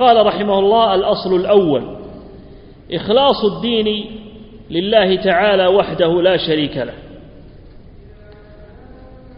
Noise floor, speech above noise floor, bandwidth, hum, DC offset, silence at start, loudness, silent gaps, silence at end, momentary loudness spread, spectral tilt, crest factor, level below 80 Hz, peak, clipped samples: -39 dBFS; 25 dB; 5.4 kHz; none; under 0.1%; 0 s; -15 LUFS; none; 0 s; 15 LU; -9 dB/octave; 16 dB; -42 dBFS; 0 dBFS; under 0.1%